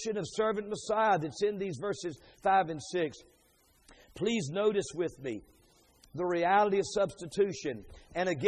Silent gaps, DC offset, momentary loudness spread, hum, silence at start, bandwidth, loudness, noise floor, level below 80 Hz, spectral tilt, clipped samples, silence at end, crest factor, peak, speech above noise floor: none; under 0.1%; 12 LU; none; 0 s; 11.5 kHz; -32 LUFS; -66 dBFS; -64 dBFS; -5 dB/octave; under 0.1%; 0 s; 20 dB; -12 dBFS; 35 dB